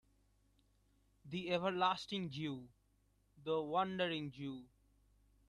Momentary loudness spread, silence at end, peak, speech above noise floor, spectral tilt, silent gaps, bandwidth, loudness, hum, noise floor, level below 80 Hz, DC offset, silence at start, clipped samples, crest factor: 12 LU; 0.8 s; -22 dBFS; 36 dB; -6 dB/octave; none; 11.5 kHz; -40 LUFS; 50 Hz at -70 dBFS; -76 dBFS; -74 dBFS; under 0.1%; 1.25 s; under 0.1%; 20 dB